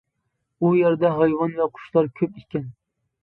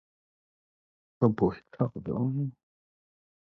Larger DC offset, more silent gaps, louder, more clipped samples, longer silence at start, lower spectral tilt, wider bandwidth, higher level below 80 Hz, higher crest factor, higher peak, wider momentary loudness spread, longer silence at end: neither; neither; first, -22 LUFS vs -30 LUFS; neither; second, 0.6 s vs 1.2 s; about the same, -11 dB/octave vs -11.5 dB/octave; second, 4.3 kHz vs 5.6 kHz; about the same, -62 dBFS vs -60 dBFS; about the same, 18 dB vs 22 dB; first, -6 dBFS vs -10 dBFS; first, 13 LU vs 8 LU; second, 0.55 s vs 0.9 s